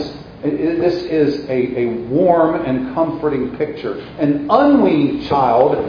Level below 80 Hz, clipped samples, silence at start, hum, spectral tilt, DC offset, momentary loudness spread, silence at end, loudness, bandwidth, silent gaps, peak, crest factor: -46 dBFS; under 0.1%; 0 s; none; -8.5 dB/octave; under 0.1%; 10 LU; 0 s; -16 LUFS; 5.4 kHz; none; 0 dBFS; 16 dB